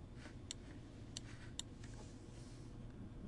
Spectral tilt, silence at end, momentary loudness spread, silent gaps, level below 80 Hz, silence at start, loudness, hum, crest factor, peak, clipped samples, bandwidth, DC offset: -4 dB/octave; 0 s; 5 LU; none; -60 dBFS; 0 s; -53 LUFS; none; 26 dB; -26 dBFS; under 0.1%; 11.5 kHz; under 0.1%